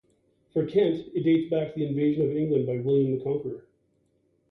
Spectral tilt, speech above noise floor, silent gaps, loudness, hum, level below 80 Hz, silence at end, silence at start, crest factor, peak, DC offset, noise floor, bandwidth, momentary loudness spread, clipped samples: -10.5 dB/octave; 44 dB; none; -26 LUFS; none; -64 dBFS; 0.9 s; 0.55 s; 14 dB; -12 dBFS; under 0.1%; -69 dBFS; 4.6 kHz; 7 LU; under 0.1%